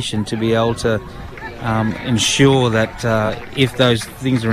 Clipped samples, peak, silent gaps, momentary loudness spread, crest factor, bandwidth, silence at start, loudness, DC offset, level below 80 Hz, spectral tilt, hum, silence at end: under 0.1%; -2 dBFS; none; 11 LU; 14 dB; 14.5 kHz; 0 s; -17 LUFS; under 0.1%; -38 dBFS; -5 dB/octave; none; 0 s